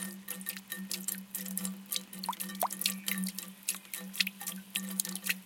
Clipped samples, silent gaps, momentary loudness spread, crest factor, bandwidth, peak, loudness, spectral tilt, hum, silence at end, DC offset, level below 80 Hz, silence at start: under 0.1%; none; 7 LU; 30 dB; 17 kHz; -8 dBFS; -35 LUFS; -2 dB/octave; none; 0 s; under 0.1%; -84 dBFS; 0 s